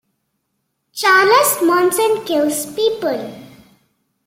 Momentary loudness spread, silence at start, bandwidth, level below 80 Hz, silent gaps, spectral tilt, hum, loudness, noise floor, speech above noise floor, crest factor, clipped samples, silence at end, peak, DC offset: 13 LU; 0.95 s; 16.5 kHz; -64 dBFS; none; -2 dB/octave; none; -15 LUFS; -71 dBFS; 57 dB; 16 dB; under 0.1%; 0.8 s; -2 dBFS; under 0.1%